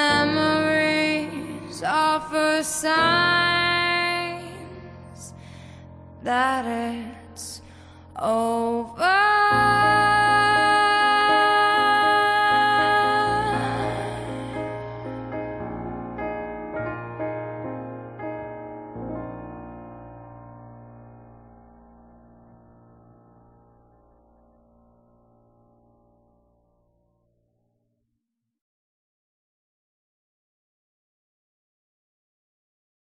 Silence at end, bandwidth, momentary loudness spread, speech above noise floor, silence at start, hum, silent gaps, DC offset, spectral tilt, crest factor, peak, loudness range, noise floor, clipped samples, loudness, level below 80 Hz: 11.8 s; 13.5 kHz; 22 LU; 58 dB; 0 s; none; none; under 0.1%; -3.5 dB/octave; 18 dB; -8 dBFS; 18 LU; -80 dBFS; under 0.1%; -21 LUFS; -54 dBFS